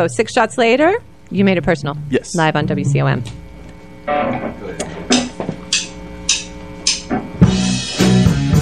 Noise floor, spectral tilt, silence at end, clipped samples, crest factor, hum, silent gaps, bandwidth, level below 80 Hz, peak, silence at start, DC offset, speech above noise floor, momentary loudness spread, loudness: -36 dBFS; -4.5 dB/octave; 0 s; under 0.1%; 16 dB; none; none; 14 kHz; -34 dBFS; 0 dBFS; 0 s; 0.8%; 21 dB; 13 LU; -17 LUFS